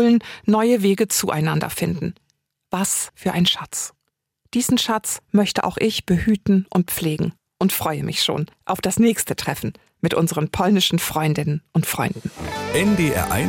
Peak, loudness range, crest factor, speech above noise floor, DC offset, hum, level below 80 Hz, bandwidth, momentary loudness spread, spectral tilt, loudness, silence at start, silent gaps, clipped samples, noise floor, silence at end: -6 dBFS; 2 LU; 14 dB; 48 dB; under 0.1%; none; -48 dBFS; 17 kHz; 9 LU; -4.5 dB/octave; -20 LUFS; 0 s; none; under 0.1%; -68 dBFS; 0 s